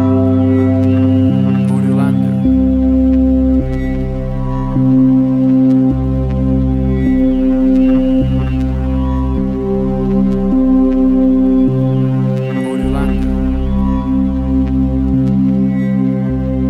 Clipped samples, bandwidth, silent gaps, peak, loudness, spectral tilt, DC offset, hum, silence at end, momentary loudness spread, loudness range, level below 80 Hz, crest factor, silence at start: under 0.1%; 4.4 kHz; none; -2 dBFS; -13 LUFS; -10 dB/octave; under 0.1%; none; 0 s; 5 LU; 2 LU; -22 dBFS; 10 dB; 0 s